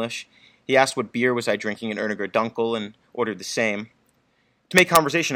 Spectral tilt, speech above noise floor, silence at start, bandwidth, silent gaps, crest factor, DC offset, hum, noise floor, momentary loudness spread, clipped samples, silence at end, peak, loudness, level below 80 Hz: -3.5 dB/octave; 43 dB; 0 s; 16 kHz; none; 24 dB; under 0.1%; none; -66 dBFS; 14 LU; under 0.1%; 0 s; 0 dBFS; -22 LUFS; -60 dBFS